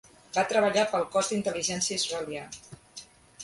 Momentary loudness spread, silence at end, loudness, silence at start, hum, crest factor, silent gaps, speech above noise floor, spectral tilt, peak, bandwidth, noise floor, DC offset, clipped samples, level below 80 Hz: 21 LU; 0 s; -27 LUFS; 0.35 s; none; 18 dB; none; 22 dB; -2.5 dB/octave; -12 dBFS; 11.5 kHz; -50 dBFS; under 0.1%; under 0.1%; -64 dBFS